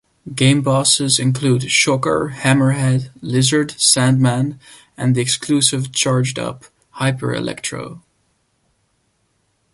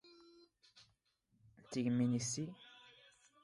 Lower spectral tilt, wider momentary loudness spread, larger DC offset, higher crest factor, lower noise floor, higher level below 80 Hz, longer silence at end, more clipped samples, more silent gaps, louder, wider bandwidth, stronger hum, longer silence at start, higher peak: about the same, -4 dB/octave vs -5 dB/octave; second, 11 LU vs 24 LU; neither; about the same, 18 dB vs 16 dB; second, -65 dBFS vs -79 dBFS; first, -52 dBFS vs -78 dBFS; first, 1.75 s vs 0.65 s; neither; neither; first, -16 LUFS vs -39 LUFS; about the same, 11.5 kHz vs 11.5 kHz; neither; first, 0.25 s vs 0.05 s; first, 0 dBFS vs -26 dBFS